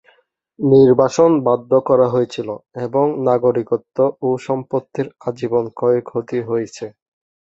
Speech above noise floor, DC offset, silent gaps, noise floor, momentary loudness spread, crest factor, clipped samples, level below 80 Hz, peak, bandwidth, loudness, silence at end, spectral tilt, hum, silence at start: 40 dB; under 0.1%; none; -57 dBFS; 13 LU; 16 dB; under 0.1%; -58 dBFS; -2 dBFS; 8 kHz; -17 LUFS; 0.65 s; -7.5 dB/octave; none; 0.6 s